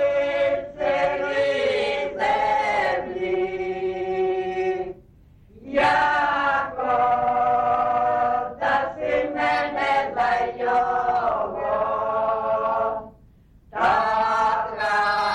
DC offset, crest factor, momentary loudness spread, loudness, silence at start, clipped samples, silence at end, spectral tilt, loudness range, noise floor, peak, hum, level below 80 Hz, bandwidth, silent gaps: under 0.1%; 12 dB; 5 LU; -22 LUFS; 0 s; under 0.1%; 0 s; -5 dB/octave; 3 LU; -52 dBFS; -10 dBFS; none; -52 dBFS; 10.5 kHz; none